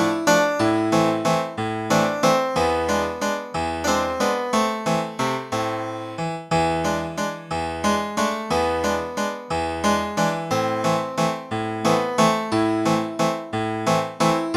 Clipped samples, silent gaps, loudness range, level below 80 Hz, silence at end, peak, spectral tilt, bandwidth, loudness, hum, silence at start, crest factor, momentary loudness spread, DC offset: under 0.1%; none; 3 LU; -48 dBFS; 0 s; -4 dBFS; -4.5 dB/octave; 15.5 kHz; -22 LUFS; none; 0 s; 18 dB; 7 LU; under 0.1%